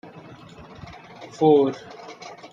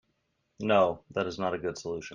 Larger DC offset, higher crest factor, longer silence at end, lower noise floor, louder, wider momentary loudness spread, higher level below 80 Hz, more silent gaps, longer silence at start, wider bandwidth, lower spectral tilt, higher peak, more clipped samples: neither; about the same, 18 dB vs 20 dB; about the same, 0.05 s vs 0 s; second, -44 dBFS vs -76 dBFS; first, -19 LUFS vs -29 LUFS; first, 26 LU vs 11 LU; about the same, -60 dBFS vs -64 dBFS; neither; first, 1.2 s vs 0.6 s; second, 7.4 kHz vs 9.6 kHz; first, -7 dB/octave vs -5.5 dB/octave; first, -6 dBFS vs -10 dBFS; neither